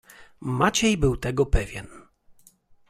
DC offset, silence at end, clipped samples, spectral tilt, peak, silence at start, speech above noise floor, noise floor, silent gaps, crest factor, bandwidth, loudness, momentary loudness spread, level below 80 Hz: under 0.1%; 0.9 s; under 0.1%; -4.5 dB/octave; -6 dBFS; 0.2 s; 33 dB; -56 dBFS; none; 20 dB; 15.5 kHz; -24 LUFS; 15 LU; -34 dBFS